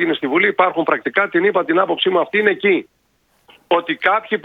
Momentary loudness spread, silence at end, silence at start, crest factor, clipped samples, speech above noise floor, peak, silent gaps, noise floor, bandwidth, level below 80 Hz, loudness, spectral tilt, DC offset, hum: 4 LU; 0.05 s; 0 s; 18 dB; under 0.1%; 38 dB; 0 dBFS; none; -54 dBFS; 4.8 kHz; -66 dBFS; -16 LUFS; -7 dB/octave; under 0.1%; none